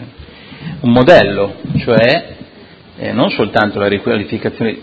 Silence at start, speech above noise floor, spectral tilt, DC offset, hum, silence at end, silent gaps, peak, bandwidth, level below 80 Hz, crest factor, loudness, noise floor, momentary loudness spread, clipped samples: 0 s; 27 dB; -7.5 dB/octave; under 0.1%; none; 0 s; none; 0 dBFS; 8 kHz; -40 dBFS; 14 dB; -13 LUFS; -39 dBFS; 14 LU; 0.5%